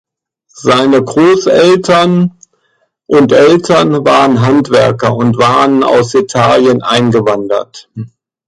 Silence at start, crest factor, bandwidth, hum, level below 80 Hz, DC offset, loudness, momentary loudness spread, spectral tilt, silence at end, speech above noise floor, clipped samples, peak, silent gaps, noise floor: 0.55 s; 10 dB; 11.5 kHz; none; -46 dBFS; under 0.1%; -9 LUFS; 10 LU; -6 dB/octave; 0.4 s; 51 dB; under 0.1%; 0 dBFS; none; -59 dBFS